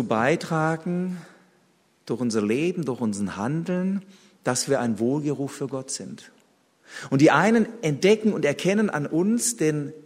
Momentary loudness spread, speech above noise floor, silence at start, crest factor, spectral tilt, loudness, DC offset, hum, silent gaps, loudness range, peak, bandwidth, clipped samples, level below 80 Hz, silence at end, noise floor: 13 LU; 39 dB; 0 s; 20 dB; -5 dB/octave; -24 LUFS; under 0.1%; none; none; 6 LU; -4 dBFS; 15.5 kHz; under 0.1%; -68 dBFS; 0.05 s; -63 dBFS